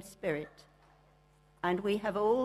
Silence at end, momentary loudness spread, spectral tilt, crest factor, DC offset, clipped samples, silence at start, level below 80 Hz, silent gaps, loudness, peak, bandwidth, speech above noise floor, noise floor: 0 s; 8 LU; -6 dB/octave; 18 dB; under 0.1%; under 0.1%; 0 s; -66 dBFS; none; -34 LUFS; -16 dBFS; 14 kHz; 33 dB; -65 dBFS